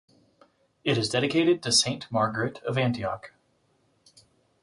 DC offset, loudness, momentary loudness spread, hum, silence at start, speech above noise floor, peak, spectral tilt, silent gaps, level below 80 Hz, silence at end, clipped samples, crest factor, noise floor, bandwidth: under 0.1%; -25 LUFS; 11 LU; none; 0.85 s; 42 dB; -8 dBFS; -4 dB/octave; none; -62 dBFS; 1.35 s; under 0.1%; 20 dB; -68 dBFS; 11.5 kHz